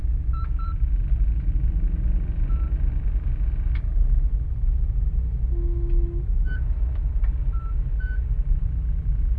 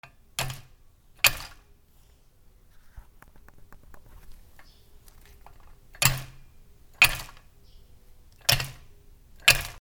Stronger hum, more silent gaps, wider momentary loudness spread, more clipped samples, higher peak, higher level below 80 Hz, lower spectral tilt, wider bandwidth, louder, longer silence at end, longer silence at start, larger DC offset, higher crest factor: neither; neither; second, 3 LU vs 22 LU; neither; second, -10 dBFS vs 0 dBFS; first, -22 dBFS vs -46 dBFS; first, -10.5 dB/octave vs -1 dB/octave; second, 2.6 kHz vs over 20 kHz; second, -27 LUFS vs -24 LUFS; about the same, 0 s vs 0 s; second, 0 s vs 0.4 s; neither; second, 12 dB vs 32 dB